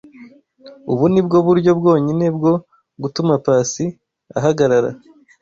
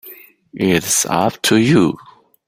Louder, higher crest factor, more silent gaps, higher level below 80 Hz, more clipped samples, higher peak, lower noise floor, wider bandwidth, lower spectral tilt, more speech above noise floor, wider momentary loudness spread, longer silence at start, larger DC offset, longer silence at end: about the same, -16 LUFS vs -15 LUFS; about the same, 14 dB vs 16 dB; neither; about the same, -54 dBFS vs -50 dBFS; neither; about the same, -2 dBFS vs -2 dBFS; about the same, -43 dBFS vs -41 dBFS; second, 7.6 kHz vs 16.5 kHz; first, -6.5 dB/octave vs -4 dB/octave; about the same, 28 dB vs 26 dB; first, 12 LU vs 8 LU; first, 0.2 s vs 0.05 s; neither; about the same, 0.45 s vs 0.5 s